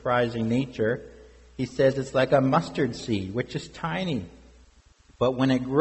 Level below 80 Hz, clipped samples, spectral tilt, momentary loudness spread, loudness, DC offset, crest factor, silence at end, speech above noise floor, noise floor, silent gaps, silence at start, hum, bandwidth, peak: -52 dBFS; under 0.1%; -6.5 dB/octave; 12 LU; -26 LUFS; under 0.1%; 18 dB; 0 s; 32 dB; -57 dBFS; none; 0.05 s; none; 8.2 kHz; -8 dBFS